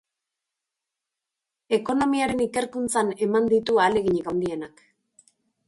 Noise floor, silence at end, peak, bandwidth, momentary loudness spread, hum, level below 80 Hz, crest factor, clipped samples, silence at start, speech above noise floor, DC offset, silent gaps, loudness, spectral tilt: -86 dBFS; 1 s; -8 dBFS; 11.5 kHz; 7 LU; none; -58 dBFS; 16 dB; under 0.1%; 1.7 s; 63 dB; under 0.1%; none; -23 LUFS; -4.5 dB/octave